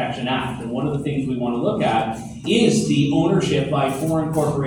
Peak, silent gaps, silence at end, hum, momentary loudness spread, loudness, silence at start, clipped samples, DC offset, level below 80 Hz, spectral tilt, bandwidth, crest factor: -4 dBFS; none; 0 s; none; 7 LU; -20 LUFS; 0 s; under 0.1%; under 0.1%; -46 dBFS; -6 dB/octave; 19.5 kHz; 16 dB